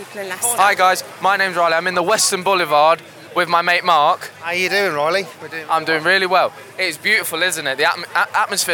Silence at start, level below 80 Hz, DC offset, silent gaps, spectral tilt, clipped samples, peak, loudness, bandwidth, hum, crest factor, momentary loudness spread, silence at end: 0 s; -78 dBFS; under 0.1%; none; -1.5 dB/octave; under 0.1%; 0 dBFS; -16 LUFS; 19 kHz; none; 16 dB; 8 LU; 0 s